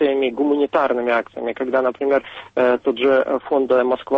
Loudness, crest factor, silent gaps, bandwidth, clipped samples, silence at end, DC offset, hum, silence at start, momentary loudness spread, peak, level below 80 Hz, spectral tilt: -19 LUFS; 14 dB; none; 6 kHz; under 0.1%; 0 s; under 0.1%; none; 0 s; 4 LU; -6 dBFS; -60 dBFS; -6.5 dB/octave